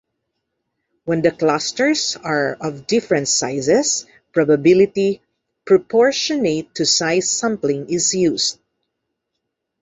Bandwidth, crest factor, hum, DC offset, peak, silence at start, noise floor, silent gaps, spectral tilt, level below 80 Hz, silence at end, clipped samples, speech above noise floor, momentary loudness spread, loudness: 8.2 kHz; 16 dB; none; under 0.1%; -2 dBFS; 1.05 s; -77 dBFS; none; -3.5 dB/octave; -60 dBFS; 1.3 s; under 0.1%; 60 dB; 7 LU; -17 LUFS